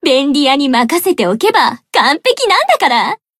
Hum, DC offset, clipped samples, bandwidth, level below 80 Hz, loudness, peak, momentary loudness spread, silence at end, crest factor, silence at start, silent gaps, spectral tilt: none; under 0.1%; under 0.1%; 16 kHz; -60 dBFS; -11 LUFS; 0 dBFS; 3 LU; 0.25 s; 12 dB; 0.05 s; none; -3 dB/octave